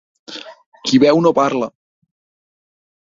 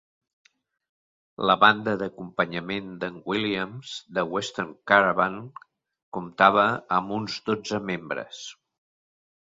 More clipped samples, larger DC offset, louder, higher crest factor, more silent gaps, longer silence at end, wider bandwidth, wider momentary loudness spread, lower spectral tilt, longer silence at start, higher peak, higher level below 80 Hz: neither; neither; first, -15 LUFS vs -24 LUFS; second, 18 dB vs 24 dB; about the same, 0.66-0.72 s vs 6.03-6.12 s; first, 1.35 s vs 1 s; about the same, 7.6 kHz vs 7.8 kHz; first, 21 LU vs 18 LU; about the same, -5.5 dB/octave vs -4.5 dB/octave; second, 0.3 s vs 1.4 s; about the same, -2 dBFS vs -2 dBFS; about the same, -60 dBFS vs -64 dBFS